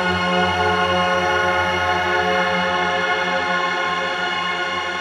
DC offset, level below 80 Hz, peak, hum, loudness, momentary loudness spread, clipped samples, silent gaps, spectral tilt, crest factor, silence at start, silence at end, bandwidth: under 0.1%; -50 dBFS; -6 dBFS; none; -19 LUFS; 3 LU; under 0.1%; none; -4 dB/octave; 14 dB; 0 s; 0 s; 13.5 kHz